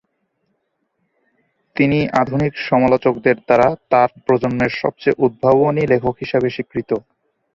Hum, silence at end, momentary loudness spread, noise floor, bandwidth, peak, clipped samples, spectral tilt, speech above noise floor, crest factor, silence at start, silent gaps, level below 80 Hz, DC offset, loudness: none; 0.55 s; 7 LU; -70 dBFS; 7.4 kHz; -2 dBFS; under 0.1%; -8 dB/octave; 54 dB; 16 dB; 1.75 s; none; -48 dBFS; under 0.1%; -17 LUFS